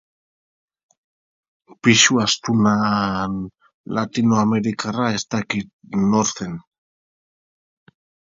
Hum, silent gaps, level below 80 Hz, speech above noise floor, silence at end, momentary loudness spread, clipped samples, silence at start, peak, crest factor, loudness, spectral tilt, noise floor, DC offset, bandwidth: none; 3.74-3.84 s, 5.73-5.79 s; -54 dBFS; over 71 dB; 1.75 s; 14 LU; under 0.1%; 1.85 s; -2 dBFS; 20 dB; -19 LUFS; -4 dB/octave; under -90 dBFS; under 0.1%; 7.8 kHz